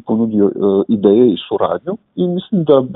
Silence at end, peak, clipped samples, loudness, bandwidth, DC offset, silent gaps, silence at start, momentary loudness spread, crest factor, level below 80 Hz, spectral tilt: 0 s; 0 dBFS; under 0.1%; -14 LUFS; 4 kHz; under 0.1%; none; 0.05 s; 8 LU; 14 dB; -58 dBFS; -12.5 dB/octave